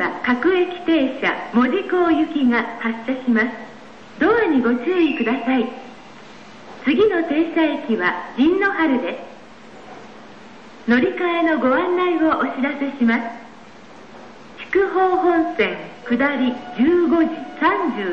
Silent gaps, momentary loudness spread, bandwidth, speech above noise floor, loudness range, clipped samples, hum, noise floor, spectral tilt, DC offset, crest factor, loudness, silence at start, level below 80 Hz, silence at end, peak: none; 13 LU; 7 kHz; 24 dB; 3 LU; under 0.1%; none; -42 dBFS; -6.5 dB/octave; 0.5%; 14 dB; -19 LUFS; 0 s; -56 dBFS; 0 s; -6 dBFS